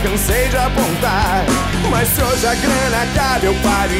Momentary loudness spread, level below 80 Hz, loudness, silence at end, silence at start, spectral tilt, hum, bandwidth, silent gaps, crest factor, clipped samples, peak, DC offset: 2 LU; -24 dBFS; -15 LUFS; 0 s; 0 s; -4 dB/octave; none; 16.5 kHz; none; 12 dB; under 0.1%; -4 dBFS; under 0.1%